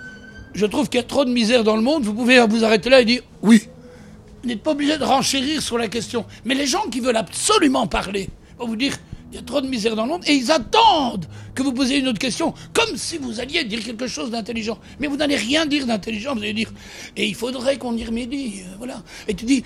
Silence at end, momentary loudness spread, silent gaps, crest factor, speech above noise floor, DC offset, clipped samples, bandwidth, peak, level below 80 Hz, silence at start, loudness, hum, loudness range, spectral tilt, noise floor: 0 s; 16 LU; none; 20 dB; 22 dB; under 0.1%; under 0.1%; 15 kHz; 0 dBFS; -46 dBFS; 0 s; -20 LUFS; none; 6 LU; -3.5 dB/octave; -42 dBFS